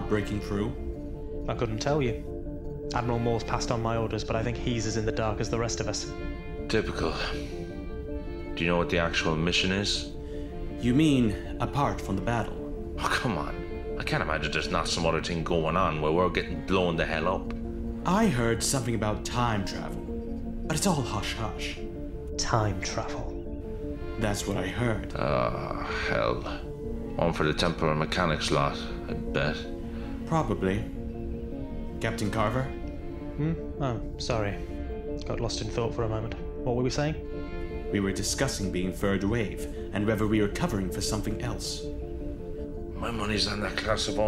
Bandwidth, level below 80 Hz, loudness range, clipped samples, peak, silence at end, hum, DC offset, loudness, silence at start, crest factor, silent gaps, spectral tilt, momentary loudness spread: 16 kHz; -38 dBFS; 4 LU; under 0.1%; -8 dBFS; 0 s; none; under 0.1%; -30 LUFS; 0 s; 20 dB; none; -5 dB/octave; 11 LU